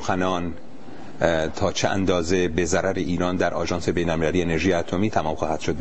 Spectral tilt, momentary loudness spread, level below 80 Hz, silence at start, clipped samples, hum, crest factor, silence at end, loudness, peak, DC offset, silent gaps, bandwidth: -5 dB/octave; 6 LU; -44 dBFS; 0 s; under 0.1%; none; 22 dB; 0 s; -23 LUFS; -2 dBFS; 3%; none; 8.6 kHz